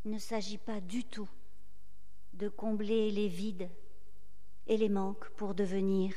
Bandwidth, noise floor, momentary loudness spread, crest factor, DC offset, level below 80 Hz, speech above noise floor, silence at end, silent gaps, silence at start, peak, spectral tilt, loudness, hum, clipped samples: 13.5 kHz; -64 dBFS; 14 LU; 18 dB; 2%; -66 dBFS; 30 dB; 0 s; none; 0.05 s; -20 dBFS; -6.5 dB/octave; -36 LUFS; none; under 0.1%